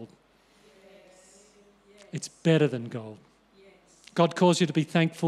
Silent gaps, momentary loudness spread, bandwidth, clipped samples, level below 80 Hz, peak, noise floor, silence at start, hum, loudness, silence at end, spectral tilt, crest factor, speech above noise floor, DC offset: none; 17 LU; 12 kHz; under 0.1%; -74 dBFS; -10 dBFS; -62 dBFS; 0 s; none; -26 LUFS; 0 s; -6 dB/octave; 18 dB; 37 dB; under 0.1%